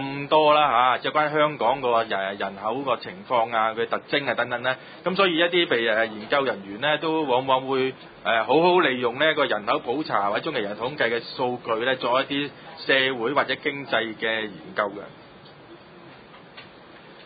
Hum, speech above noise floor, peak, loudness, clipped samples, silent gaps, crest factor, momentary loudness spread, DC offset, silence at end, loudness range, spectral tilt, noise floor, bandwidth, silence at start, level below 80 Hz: none; 23 dB; -4 dBFS; -23 LUFS; under 0.1%; none; 20 dB; 9 LU; under 0.1%; 0 s; 4 LU; -9 dB/octave; -47 dBFS; 5 kHz; 0 s; -66 dBFS